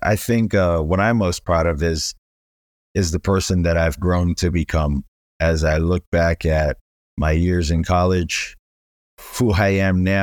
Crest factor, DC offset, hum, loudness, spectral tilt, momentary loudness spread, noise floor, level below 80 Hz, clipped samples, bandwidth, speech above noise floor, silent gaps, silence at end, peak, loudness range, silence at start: 14 dB; under 0.1%; none; -19 LUFS; -6 dB/octave; 7 LU; under -90 dBFS; -30 dBFS; under 0.1%; 19 kHz; over 72 dB; 2.18-2.95 s, 5.08-5.40 s, 6.07-6.12 s, 6.81-7.17 s, 8.59-9.17 s; 0 s; -4 dBFS; 1 LU; 0 s